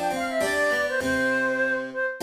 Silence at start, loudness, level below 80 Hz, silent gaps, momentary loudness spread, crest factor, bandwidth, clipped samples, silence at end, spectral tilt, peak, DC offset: 0 s; -24 LUFS; -54 dBFS; none; 4 LU; 14 dB; 15.5 kHz; under 0.1%; 0 s; -3.5 dB/octave; -12 dBFS; under 0.1%